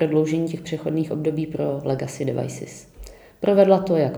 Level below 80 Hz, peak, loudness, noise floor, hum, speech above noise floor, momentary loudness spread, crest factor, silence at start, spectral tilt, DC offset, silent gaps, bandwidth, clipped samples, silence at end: -52 dBFS; -2 dBFS; -22 LUFS; -42 dBFS; none; 21 dB; 13 LU; 20 dB; 0 s; -7 dB/octave; under 0.1%; none; over 20 kHz; under 0.1%; 0 s